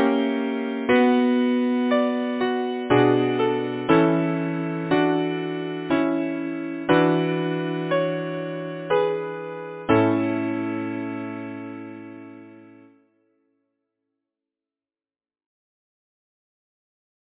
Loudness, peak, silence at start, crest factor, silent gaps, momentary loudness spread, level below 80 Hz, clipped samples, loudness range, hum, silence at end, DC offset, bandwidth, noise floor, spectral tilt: -23 LUFS; -6 dBFS; 0 s; 18 dB; none; 14 LU; -62 dBFS; under 0.1%; 12 LU; none; 4.65 s; under 0.1%; 4 kHz; under -90 dBFS; -10.5 dB/octave